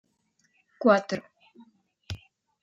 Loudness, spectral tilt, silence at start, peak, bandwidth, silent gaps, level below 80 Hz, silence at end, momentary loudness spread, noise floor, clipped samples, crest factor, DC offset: -25 LUFS; -6 dB/octave; 0.8 s; -6 dBFS; 7.8 kHz; none; -62 dBFS; 0.45 s; 19 LU; -71 dBFS; under 0.1%; 24 dB; under 0.1%